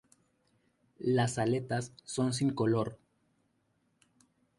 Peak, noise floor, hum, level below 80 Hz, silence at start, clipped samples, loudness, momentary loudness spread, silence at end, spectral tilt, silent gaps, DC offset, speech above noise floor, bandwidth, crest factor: -18 dBFS; -75 dBFS; none; -68 dBFS; 1 s; under 0.1%; -32 LUFS; 8 LU; 1.65 s; -6 dB/octave; none; under 0.1%; 44 dB; 11.5 kHz; 18 dB